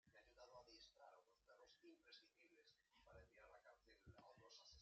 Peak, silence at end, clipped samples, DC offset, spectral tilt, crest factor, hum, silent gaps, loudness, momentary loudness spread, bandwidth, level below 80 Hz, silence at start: -54 dBFS; 0 s; under 0.1%; under 0.1%; -2.5 dB/octave; 16 dB; none; none; -68 LUFS; 4 LU; 7.4 kHz; -84 dBFS; 0.05 s